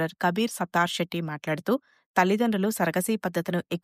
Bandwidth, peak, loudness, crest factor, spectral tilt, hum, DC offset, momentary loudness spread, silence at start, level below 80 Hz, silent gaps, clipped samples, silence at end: 15.5 kHz; -10 dBFS; -27 LUFS; 18 dB; -5 dB/octave; none; under 0.1%; 7 LU; 0 s; -70 dBFS; 2.06-2.14 s; under 0.1%; 0.05 s